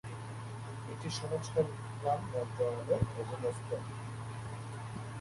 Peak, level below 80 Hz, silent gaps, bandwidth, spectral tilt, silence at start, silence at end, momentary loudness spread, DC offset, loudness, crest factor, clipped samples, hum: -18 dBFS; -58 dBFS; none; 11.5 kHz; -6 dB/octave; 0.05 s; 0 s; 10 LU; under 0.1%; -38 LUFS; 20 dB; under 0.1%; none